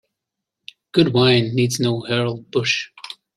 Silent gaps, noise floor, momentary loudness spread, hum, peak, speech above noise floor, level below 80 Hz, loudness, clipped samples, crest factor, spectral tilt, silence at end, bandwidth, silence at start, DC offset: none; -83 dBFS; 8 LU; none; -2 dBFS; 64 dB; -58 dBFS; -19 LUFS; under 0.1%; 18 dB; -5 dB/octave; 0.25 s; 13.5 kHz; 0.95 s; under 0.1%